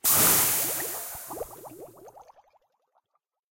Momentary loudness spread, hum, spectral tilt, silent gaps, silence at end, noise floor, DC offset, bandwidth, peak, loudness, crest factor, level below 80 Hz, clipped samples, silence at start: 24 LU; none; -1 dB/octave; none; 1.3 s; -79 dBFS; under 0.1%; 16.5 kHz; -8 dBFS; -22 LUFS; 20 dB; -60 dBFS; under 0.1%; 0.05 s